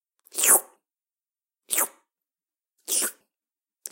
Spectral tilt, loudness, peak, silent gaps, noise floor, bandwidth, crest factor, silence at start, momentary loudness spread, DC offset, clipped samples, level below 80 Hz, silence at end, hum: 2 dB/octave; -22 LUFS; -4 dBFS; none; under -90 dBFS; 17 kHz; 26 dB; 0.35 s; 19 LU; under 0.1%; under 0.1%; under -90 dBFS; 0.05 s; none